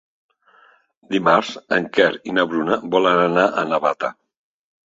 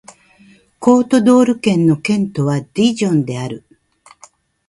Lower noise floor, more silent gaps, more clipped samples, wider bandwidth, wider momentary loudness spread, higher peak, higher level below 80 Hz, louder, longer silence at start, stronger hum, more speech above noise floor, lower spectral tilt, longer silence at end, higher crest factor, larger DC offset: first, -54 dBFS vs -49 dBFS; neither; neither; second, 7.8 kHz vs 11.5 kHz; second, 6 LU vs 11 LU; about the same, -2 dBFS vs 0 dBFS; second, -64 dBFS vs -56 dBFS; second, -19 LUFS vs -15 LUFS; first, 1.1 s vs 0.8 s; neither; about the same, 36 dB vs 35 dB; about the same, -5.5 dB/octave vs -6.5 dB/octave; second, 0.75 s vs 1.1 s; about the same, 18 dB vs 16 dB; neither